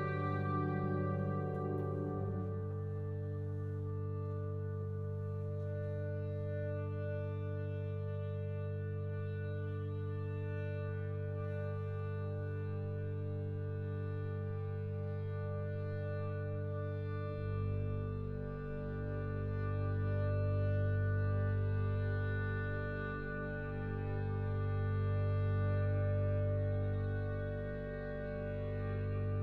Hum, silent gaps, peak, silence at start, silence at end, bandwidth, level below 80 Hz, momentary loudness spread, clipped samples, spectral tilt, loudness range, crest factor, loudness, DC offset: 50 Hz at -75 dBFS; none; -24 dBFS; 0 s; 0 s; 4.4 kHz; -52 dBFS; 6 LU; under 0.1%; -10.5 dB/octave; 5 LU; 12 dB; -39 LUFS; under 0.1%